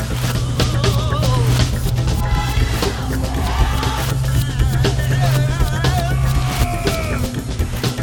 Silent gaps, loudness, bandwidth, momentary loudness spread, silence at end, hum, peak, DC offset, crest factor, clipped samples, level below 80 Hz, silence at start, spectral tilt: none; -18 LUFS; 19.5 kHz; 4 LU; 0 s; none; -2 dBFS; under 0.1%; 16 dB; under 0.1%; -22 dBFS; 0 s; -5.5 dB/octave